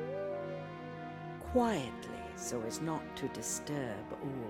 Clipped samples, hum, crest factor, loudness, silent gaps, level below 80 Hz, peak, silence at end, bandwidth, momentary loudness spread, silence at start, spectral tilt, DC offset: under 0.1%; none; 20 dB; -38 LUFS; none; -60 dBFS; -18 dBFS; 0 s; 17 kHz; 12 LU; 0 s; -4.5 dB/octave; under 0.1%